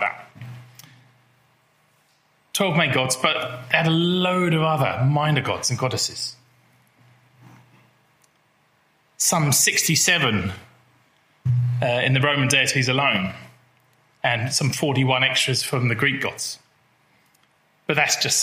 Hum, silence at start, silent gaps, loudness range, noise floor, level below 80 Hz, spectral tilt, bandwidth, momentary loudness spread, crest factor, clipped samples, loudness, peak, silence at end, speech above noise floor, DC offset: none; 0 s; none; 6 LU; -62 dBFS; -62 dBFS; -3.5 dB/octave; 16 kHz; 13 LU; 22 dB; under 0.1%; -20 LUFS; 0 dBFS; 0 s; 42 dB; under 0.1%